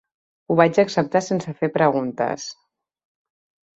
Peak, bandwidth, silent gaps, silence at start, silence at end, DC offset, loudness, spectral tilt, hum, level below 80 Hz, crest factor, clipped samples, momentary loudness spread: -2 dBFS; 8.2 kHz; none; 0.5 s; 1.25 s; under 0.1%; -20 LUFS; -6 dB/octave; none; -64 dBFS; 20 dB; under 0.1%; 9 LU